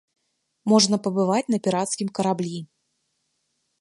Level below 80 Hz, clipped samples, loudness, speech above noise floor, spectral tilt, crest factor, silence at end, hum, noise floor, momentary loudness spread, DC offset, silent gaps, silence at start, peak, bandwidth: -72 dBFS; under 0.1%; -22 LUFS; 52 dB; -4.5 dB/octave; 20 dB; 1.15 s; none; -74 dBFS; 13 LU; under 0.1%; none; 0.65 s; -4 dBFS; 11.5 kHz